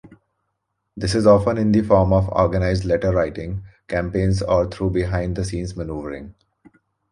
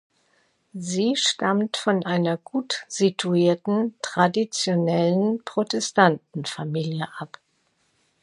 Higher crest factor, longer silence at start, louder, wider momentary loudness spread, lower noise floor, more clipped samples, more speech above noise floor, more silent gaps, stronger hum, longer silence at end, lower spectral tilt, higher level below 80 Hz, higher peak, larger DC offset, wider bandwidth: about the same, 18 dB vs 22 dB; second, 0.05 s vs 0.75 s; first, -20 LUFS vs -23 LUFS; first, 14 LU vs 10 LU; first, -75 dBFS vs -68 dBFS; neither; first, 56 dB vs 45 dB; neither; neither; second, 0.8 s vs 0.95 s; first, -7 dB/octave vs -4.5 dB/octave; first, -34 dBFS vs -72 dBFS; about the same, -2 dBFS vs -2 dBFS; neither; about the same, 11.5 kHz vs 11.5 kHz